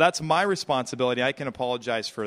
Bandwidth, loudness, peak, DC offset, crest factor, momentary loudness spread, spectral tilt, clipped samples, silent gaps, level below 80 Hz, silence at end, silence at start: 15 kHz; -25 LUFS; -6 dBFS; under 0.1%; 20 dB; 6 LU; -4 dB/octave; under 0.1%; none; -62 dBFS; 0 s; 0 s